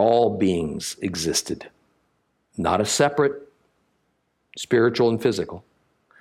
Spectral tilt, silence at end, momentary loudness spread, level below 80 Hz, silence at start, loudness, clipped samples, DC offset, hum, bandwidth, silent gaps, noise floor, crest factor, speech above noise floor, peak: -4.5 dB/octave; 0.6 s; 16 LU; -58 dBFS; 0 s; -22 LUFS; under 0.1%; under 0.1%; none; 16 kHz; none; -71 dBFS; 18 dB; 49 dB; -4 dBFS